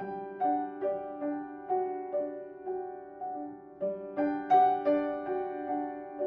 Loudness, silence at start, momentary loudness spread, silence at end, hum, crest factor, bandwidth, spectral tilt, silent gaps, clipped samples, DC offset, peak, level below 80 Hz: -32 LUFS; 0 s; 13 LU; 0 s; none; 18 dB; 5.2 kHz; -8.5 dB/octave; none; under 0.1%; under 0.1%; -14 dBFS; -72 dBFS